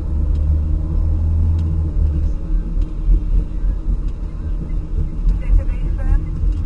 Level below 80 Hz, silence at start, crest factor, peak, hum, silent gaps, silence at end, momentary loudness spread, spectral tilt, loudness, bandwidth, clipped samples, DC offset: -18 dBFS; 0 s; 14 dB; -4 dBFS; none; none; 0 s; 7 LU; -10 dB/octave; -21 LUFS; 2.9 kHz; under 0.1%; under 0.1%